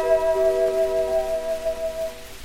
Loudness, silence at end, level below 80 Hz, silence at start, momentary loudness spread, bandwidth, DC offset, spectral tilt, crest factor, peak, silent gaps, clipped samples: -23 LUFS; 0 s; -44 dBFS; 0 s; 8 LU; 16.5 kHz; under 0.1%; -4 dB/octave; 14 dB; -8 dBFS; none; under 0.1%